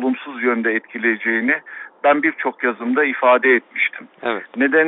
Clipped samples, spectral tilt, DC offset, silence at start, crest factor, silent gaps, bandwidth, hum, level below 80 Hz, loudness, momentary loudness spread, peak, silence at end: under 0.1%; -2 dB/octave; under 0.1%; 0 s; 16 dB; none; 4.1 kHz; none; -70 dBFS; -18 LUFS; 9 LU; -2 dBFS; 0 s